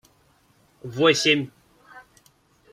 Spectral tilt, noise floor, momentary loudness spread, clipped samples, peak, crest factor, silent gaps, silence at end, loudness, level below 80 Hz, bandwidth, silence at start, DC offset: -3.5 dB/octave; -61 dBFS; 20 LU; under 0.1%; -4 dBFS; 22 dB; none; 0.75 s; -20 LUFS; -66 dBFS; 15.5 kHz; 0.85 s; under 0.1%